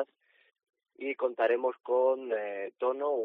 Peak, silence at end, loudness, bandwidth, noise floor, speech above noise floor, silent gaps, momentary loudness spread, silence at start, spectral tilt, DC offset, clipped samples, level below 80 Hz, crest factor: -16 dBFS; 0 s; -31 LUFS; 4 kHz; -62 dBFS; 32 dB; none; 10 LU; 0 s; -1 dB/octave; under 0.1%; under 0.1%; under -90 dBFS; 16 dB